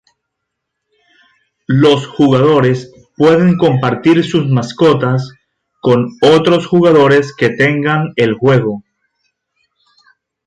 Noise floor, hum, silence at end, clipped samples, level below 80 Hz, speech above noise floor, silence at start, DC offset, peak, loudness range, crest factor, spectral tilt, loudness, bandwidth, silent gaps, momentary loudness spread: -75 dBFS; none; 1.65 s; under 0.1%; -50 dBFS; 64 dB; 1.7 s; under 0.1%; 0 dBFS; 3 LU; 12 dB; -7 dB/octave; -11 LUFS; 10.5 kHz; none; 8 LU